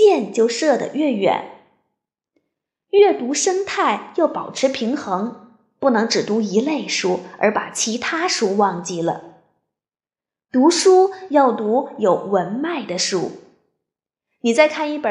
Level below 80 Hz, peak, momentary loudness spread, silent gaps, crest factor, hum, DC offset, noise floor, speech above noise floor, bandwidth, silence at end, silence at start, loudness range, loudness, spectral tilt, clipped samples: -70 dBFS; -2 dBFS; 9 LU; none; 18 dB; none; under 0.1%; under -90 dBFS; over 72 dB; 11.5 kHz; 0 s; 0 s; 3 LU; -19 LUFS; -3.5 dB/octave; under 0.1%